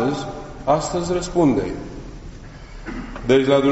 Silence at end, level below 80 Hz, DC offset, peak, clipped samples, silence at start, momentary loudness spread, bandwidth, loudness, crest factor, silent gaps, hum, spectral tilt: 0 s; -38 dBFS; under 0.1%; -2 dBFS; under 0.1%; 0 s; 22 LU; 8 kHz; -20 LUFS; 18 dB; none; none; -5.5 dB/octave